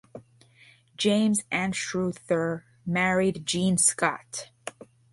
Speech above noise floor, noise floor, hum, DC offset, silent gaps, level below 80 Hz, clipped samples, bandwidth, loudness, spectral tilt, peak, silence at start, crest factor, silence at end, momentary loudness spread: 32 dB; -57 dBFS; none; under 0.1%; none; -62 dBFS; under 0.1%; 12 kHz; -26 LUFS; -3.5 dB/octave; -8 dBFS; 0.15 s; 18 dB; 0.4 s; 15 LU